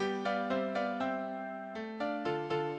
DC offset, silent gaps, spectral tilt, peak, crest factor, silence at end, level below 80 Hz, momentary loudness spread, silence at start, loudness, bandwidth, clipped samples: under 0.1%; none; -6.5 dB/octave; -20 dBFS; 16 dB; 0 s; -74 dBFS; 8 LU; 0 s; -36 LUFS; 9.4 kHz; under 0.1%